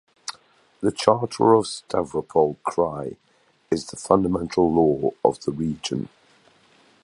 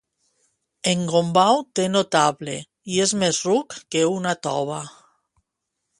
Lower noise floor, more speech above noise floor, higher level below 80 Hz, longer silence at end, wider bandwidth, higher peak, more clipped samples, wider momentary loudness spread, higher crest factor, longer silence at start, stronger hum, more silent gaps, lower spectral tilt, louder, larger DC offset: second, -57 dBFS vs -80 dBFS; second, 36 dB vs 59 dB; first, -52 dBFS vs -64 dBFS; about the same, 1 s vs 1.1 s; about the same, 11.5 kHz vs 11.5 kHz; about the same, 0 dBFS vs -2 dBFS; neither; about the same, 13 LU vs 13 LU; about the same, 22 dB vs 20 dB; second, 0.3 s vs 0.85 s; neither; neither; first, -6 dB/octave vs -4 dB/octave; about the same, -22 LUFS vs -21 LUFS; neither